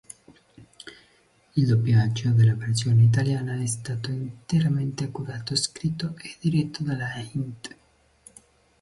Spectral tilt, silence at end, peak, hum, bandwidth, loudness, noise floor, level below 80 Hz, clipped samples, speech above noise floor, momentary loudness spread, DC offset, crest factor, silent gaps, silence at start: -5.5 dB/octave; 1.15 s; -10 dBFS; none; 11.5 kHz; -25 LUFS; -61 dBFS; -54 dBFS; under 0.1%; 38 dB; 15 LU; under 0.1%; 16 dB; none; 0.6 s